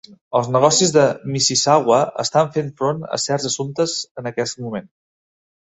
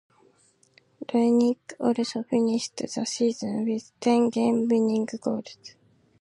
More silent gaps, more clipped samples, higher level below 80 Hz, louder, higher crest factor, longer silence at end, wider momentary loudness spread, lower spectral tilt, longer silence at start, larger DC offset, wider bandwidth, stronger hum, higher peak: first, 0.21-0.31 s, 4.11-4.15 s vs none; neither; first, -60 dBFS vs -72 dBFS; first, -18 LUFS vs -25 LUFS; about the same, 18 dB vs 16 dB; first, 0.85 s vs 0.5 s; about the same, 11 LU vs 9 LU; second, -3.5 dB/octave vs -5 dB/octave; second, 0.1 s vs 1 s; neither; second, 8.4 kHz vs 11 kHz; neither; first, -2 dBFS vs -10 dBFS